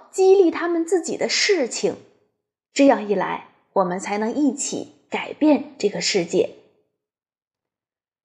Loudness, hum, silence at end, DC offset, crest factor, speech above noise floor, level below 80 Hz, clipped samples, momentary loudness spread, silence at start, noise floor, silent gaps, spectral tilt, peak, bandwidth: -21 LUFS; none; 1.7 s; under 0.1%; 20 dB; over 70 dB; -72 dBFS; under 0.1%; 12 LU; 0.15 s; under -90 dBFS; none; -3.5 dB/octave; -2 dBFS; 11.5 kHz